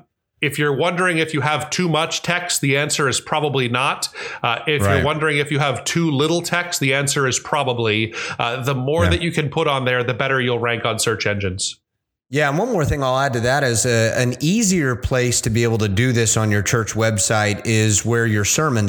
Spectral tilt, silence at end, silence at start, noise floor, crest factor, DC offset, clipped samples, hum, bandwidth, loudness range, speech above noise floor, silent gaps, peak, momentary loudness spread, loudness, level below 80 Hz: -4 dB/octave; 0 s; 0.4 s; -68 dBFS; 18 dB; under 0.1%; under 0.1%; none; 19 kHz; 2 LU; 49 dB; none; 0 dBFS; 4 LU; -18 LUFS; -42 dBFS